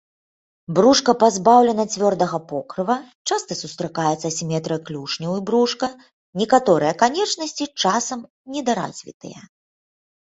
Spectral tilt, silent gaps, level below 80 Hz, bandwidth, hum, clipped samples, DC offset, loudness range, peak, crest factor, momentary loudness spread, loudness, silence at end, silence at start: -4 dB/octave; 3.15-3.25 s, 6.13-6.33 s, 8.30-8.45 s, 9.14-9.20 s; -62 dBFS; 8.2 kHz; none; under 0.1%; under 0.1%; 6 LU; -2 dBFS; 20 dB; 14 LU; -20 LUFS; 0.85 s; 0.7 s